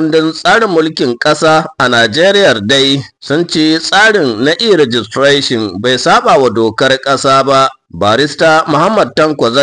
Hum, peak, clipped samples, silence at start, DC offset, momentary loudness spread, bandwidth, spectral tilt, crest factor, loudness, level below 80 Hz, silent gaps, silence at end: none; 0 dBFS; under 0.1%; 0 s; 0.1%; 5 LU; 10.5 kHz; -4 dB/octave; 8 dB; -9 LUFS; -50 dBFS; none; 0 s